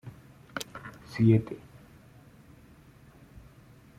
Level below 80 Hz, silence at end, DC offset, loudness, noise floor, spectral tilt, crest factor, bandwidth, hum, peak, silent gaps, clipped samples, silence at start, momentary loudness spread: -60 dBFS; 2.4 s; under 0.1%; -29 LUFS; -55 dBFS; -7.5 dB/octave; 22 dB; 15 kHz; none; -10 dBFS; none; under 0.1%; 0.05 s; 21 LU